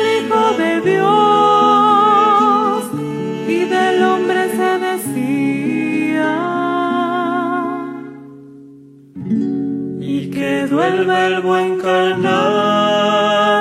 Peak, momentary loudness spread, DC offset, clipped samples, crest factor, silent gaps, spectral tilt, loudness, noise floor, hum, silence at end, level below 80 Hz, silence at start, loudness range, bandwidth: -2 dBFS; 10 LU; under 0.1%; under 0.1%; 14 dB; none; -5 dB/octave; -15 LUFS; -41 dBFS; none; 0 s; -66 dBFS; 0 s; 8 LU; 15.5 kHz